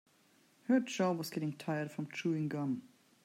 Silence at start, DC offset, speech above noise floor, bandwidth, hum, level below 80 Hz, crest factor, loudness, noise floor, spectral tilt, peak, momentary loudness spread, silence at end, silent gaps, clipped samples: 0.7 s; under 0.1%; 33 dB; 16 kHz; none; -86 dBFS; 18 dB; -36 LUFS; -69 dBFS; -6 dB/octave; -18 dBFS; 8 LU; 0.4 s; none; under 0.1%